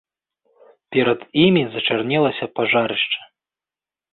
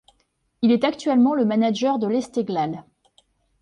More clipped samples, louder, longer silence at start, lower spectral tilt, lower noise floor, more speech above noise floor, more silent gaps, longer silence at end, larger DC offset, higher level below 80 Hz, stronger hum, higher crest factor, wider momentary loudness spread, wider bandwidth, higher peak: neither; about the same, -19 LUFS vs -21 LUFS; first, 0.9 s vs 0.6 s; first, -10.5 dB/octave vs -6 dB/octave; first, under -90 dBFS vs -69 dBFS; first, over 71 dB vs 48 dB; neither; about the same, 0.9 s vs 0.8 s; neither; first, -60 dBFS vs -66 dBFS; neither; about the same, 18 dB vs 16 dB; about the same, 7 LU vs 7 LU; second, 4.3 kHz vs 9.6 kHz; first, -2 dBFS vs -8 dBFS